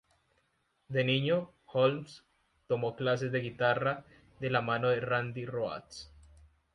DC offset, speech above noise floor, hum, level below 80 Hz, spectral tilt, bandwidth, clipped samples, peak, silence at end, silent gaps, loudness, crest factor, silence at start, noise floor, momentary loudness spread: under 0.1%; 44 dB; none; -66 dBFS; -6.5 dB/octave; 10.5 kHz; under 0.1%; -12 dBFS; 0.65 s; none; -32 LUFS; 20 dB; 0.9 s; -76 dBFS; 12 LU